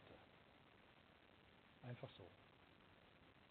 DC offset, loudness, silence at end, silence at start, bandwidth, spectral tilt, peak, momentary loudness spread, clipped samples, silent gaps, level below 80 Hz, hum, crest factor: under 0.1%; -64 LUFS; 0 s; 0 s; 4.3 kHz; -4.5 dB/octave; -38 dBFS; 12 LU; under 0.1%; none; -84 dBFS; none; 24 dB